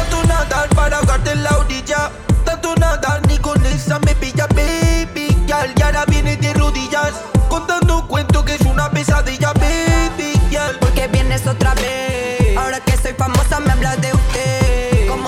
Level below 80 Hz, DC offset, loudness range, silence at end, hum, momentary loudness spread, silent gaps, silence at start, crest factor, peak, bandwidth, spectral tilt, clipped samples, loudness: -18 dBFS; under 0.1%; 1 LU; 0 s; none; 3 LU; none; 0 s; 14 dB; 0 dBFS; 15.5 kHz; -5 dB/octave; under 0.1%; -16 LUFS